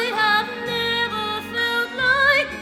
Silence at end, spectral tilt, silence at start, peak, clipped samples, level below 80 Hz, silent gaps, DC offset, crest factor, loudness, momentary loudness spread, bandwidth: 0 s; -3 dB/octave; 0 s; -6 dBFS; under 0.1%; -52 dBFS; none; under 0.1%; 16 dB; -20 LUFS; 8 LU; 18 kHz